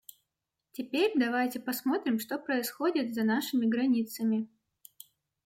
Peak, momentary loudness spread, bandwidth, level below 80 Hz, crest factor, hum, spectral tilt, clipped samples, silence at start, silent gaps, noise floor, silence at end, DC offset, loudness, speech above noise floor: -18 dBFS; 7 LU; 16.5 kHz; -80 dBFS; 14 dB; none; -4.5 dB/octave; under 0.1%; 0.8 s; none; -86 dBFS; 1 s; under 0.1%; -30 LUFS; 57 dB